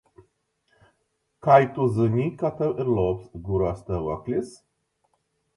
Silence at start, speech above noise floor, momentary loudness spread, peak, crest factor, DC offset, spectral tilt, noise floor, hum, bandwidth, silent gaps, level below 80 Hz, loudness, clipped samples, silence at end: 1.45 s; 51 dB; 12 LU; -4 dBFS; 22 dB; under 0.1%; -8.5 dB/octave; -74 dBFS; none; 11.5 kHz; none; -48 dBFS; -24 LUFS; under 0.1%; 1 s